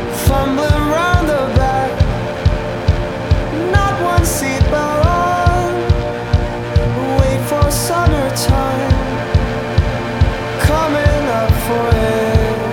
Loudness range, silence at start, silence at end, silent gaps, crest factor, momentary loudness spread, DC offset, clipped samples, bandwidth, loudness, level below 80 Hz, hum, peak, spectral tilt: 1 LU; 0 s; 0 s; none; 14 dB; 4 LU; under 0.1%; under 0.1%; 18.5 kHz; -15 LUFS; -20 dBFS; none; 0 dBFS; -6 dB/octave